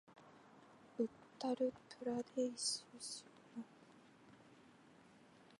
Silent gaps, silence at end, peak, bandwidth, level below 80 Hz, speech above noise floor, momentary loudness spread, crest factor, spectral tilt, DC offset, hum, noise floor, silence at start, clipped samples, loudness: none; 0.05 s; -26 dBFS; 11.5 kHz; -86 dBFS; 23 dB; 25 LU; 20 dB; -3 dB/octave; under 0.1%; none; -66 dBFS; 0.1 s; under 0.1%; -44 LUFS